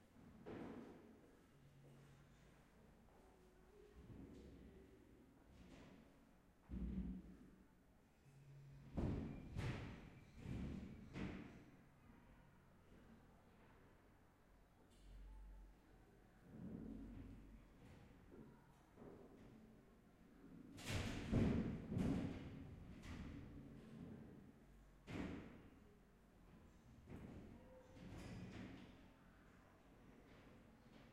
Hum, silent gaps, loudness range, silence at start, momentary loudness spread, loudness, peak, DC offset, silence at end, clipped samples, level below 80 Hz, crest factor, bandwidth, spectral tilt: none; none; 20 LU; 0 s; 21 LU; -52 LUFS; -28 dBFS; under 0.1%; 0 s; under 0.1%; -62 dBFS; 24 dB; 14.5 kHz; -7 dB/octave